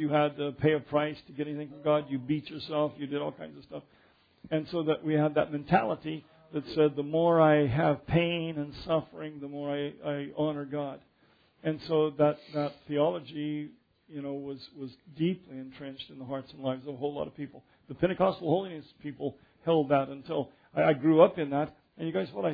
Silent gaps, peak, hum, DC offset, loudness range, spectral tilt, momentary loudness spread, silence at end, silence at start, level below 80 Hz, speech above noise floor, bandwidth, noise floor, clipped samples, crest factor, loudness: none; -6 dBFS; none; under 0.1%; 9 LU; -9.5 dB/octave; 16 LU; 0 s; 0 s; -62 dBFS; 36 dB; 5 kHz; -66 dBFS; under 0.1%; 24 dB; -30 LUFS